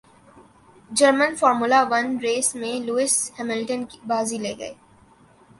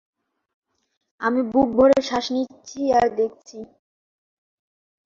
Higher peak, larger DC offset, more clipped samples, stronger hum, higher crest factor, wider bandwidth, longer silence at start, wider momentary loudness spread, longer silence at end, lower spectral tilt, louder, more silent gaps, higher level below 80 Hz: about the same, -4 dBFS vs -4 dBFS; neither; neither; neither; about the same, 20 dB vs 20 dB; first, 11.5 kHz vs 7.6 kHz; second, 0.35 s vs 1.2 s; second, 12 LU vs 18 LU; second, 0.85 s vs 1.4 s; second, -2 dB/octave vs -4.5 dB/octave; about the same, -21 LUFS vs -21 LUFS; neither; second, -64 dBFS vs -56 dBFS